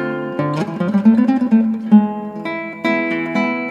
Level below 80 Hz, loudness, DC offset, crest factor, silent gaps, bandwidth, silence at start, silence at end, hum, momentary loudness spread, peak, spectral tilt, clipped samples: -64 dBFS; -17 LUFS; under 0.1%; 16 dB; none; 7 kHz; 0 s; 0 s; none; 11 LU; 0 dBFS; -8 dB/octave; under 0.1%